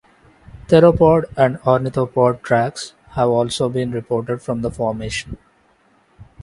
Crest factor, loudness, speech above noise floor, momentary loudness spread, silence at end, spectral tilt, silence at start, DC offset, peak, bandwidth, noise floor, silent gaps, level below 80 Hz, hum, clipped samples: 18 dB; -18 LUFS; 40 dB; 13 LU; 0.2 s; -6.5 dB/octave; 0.55 s; under 0.1%; 0 dBFS; 11.5 kHz; -57 dBFS; none; -42 dBFS; none; under 0.1%